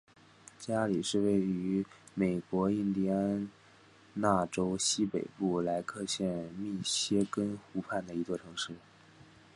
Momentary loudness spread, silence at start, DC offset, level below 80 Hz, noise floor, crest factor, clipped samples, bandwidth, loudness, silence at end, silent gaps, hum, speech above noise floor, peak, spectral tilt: 9 LU; 0.6 s; under 0.1%; -64 dBFS; -60 dBFS; 22 dB; under 0.1%; 11.5 kHz; -33 LUFS; 0.75 s; none; none; 27 dB; -12 dBFS; -4.5 dB/octave